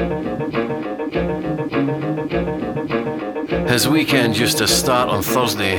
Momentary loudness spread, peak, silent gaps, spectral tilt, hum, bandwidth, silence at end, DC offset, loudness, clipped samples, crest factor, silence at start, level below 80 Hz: 8 LU; 0 dBFS; none; -4 dB/octave; none; over 20 kHz; 0 s; under 0.1%; -19 LUFS; under 0.1%; 18 dB; 0 s; -40 dBFS